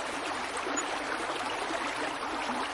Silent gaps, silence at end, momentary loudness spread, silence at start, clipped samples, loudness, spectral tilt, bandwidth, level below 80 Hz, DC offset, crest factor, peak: none; 0 s; 2 LU; 0 s; under 0.1%; -33 LUFS; -1.5 dB/octave; 11.5 kHz; -62 dBFS; under 0.1%; 14 dB; -18 dBFS